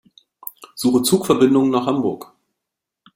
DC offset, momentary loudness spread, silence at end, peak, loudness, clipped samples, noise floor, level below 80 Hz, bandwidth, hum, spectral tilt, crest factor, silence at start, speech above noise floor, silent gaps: under 0.1%; 20 LU; 0.9 s; -2 dBFS; -17 LUFS; under 0.1%; -82 dBFS; -58 dBFS; 16.5 kHz; none; -5 dB/octave; 18 dB; 0.6 s; 66 dB; none